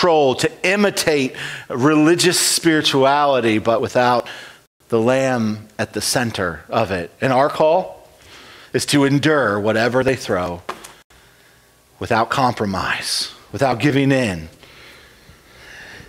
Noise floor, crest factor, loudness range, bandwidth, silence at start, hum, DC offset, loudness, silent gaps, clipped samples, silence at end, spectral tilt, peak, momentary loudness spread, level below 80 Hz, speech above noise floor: -52 dBFS; 16 dB; 6 LU; 16.5 kHz; 0 s; none; under 0.1%; -17 LUFS; 4.67-4.80 s, 11.04-11.10 s; under 0.1%; 0.05 s; -4 dB/octave; -2 dBFS; 12 LU; -52 dBFS; 35 dB